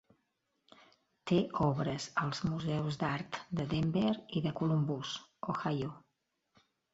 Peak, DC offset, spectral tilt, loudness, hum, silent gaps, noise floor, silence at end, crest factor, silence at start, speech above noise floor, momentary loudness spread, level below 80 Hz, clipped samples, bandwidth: -18 dBFS; under 0.1%; -6.5 dB/octave; -35 LUFS; none; none; -82 dBFS; 0.95 s; 18 dB; 1.25 s; 48 dB; 8 LU; -62 dBFS; under 0.1%; 8 kHz